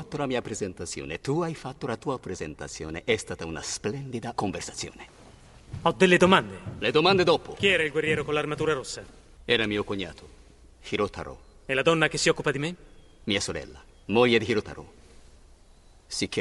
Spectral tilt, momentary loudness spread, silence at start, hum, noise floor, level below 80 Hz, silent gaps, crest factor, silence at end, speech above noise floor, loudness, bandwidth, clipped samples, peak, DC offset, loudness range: -4 dB/octave; 17 LU; 0 s; none; -54 dBFS; -52 dBFS; none; 24 dB; 0 s; 28 dB; -26 LUFS; 11.5 kHz; under 0.1%; -4 dBFS; under 0.1%; 9 LU